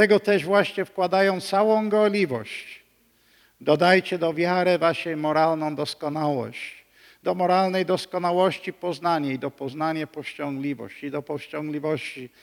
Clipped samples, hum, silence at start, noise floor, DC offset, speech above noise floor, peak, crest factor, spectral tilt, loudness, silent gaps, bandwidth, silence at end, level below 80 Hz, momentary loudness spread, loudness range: under 0.1%; none; 0 s; -62 dBFS; under 0.1%; 39 dB; -4 dBFS; 20 dB; -6 dB/octave; -24 LUFS; none; 17.5 kHz; 0.15 s; -72 dBFS; 12 LU; 6 LU